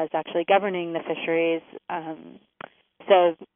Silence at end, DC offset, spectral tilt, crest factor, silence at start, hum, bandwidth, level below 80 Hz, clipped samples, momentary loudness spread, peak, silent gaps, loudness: 0.1 s; under 0.1%; -0.5 dB/octave; 20 dB; 0 s; none; 3.7 kHz; -80 dBFS; under 0.1%; 25 LU; -4 dBFS; none; -24 LUFS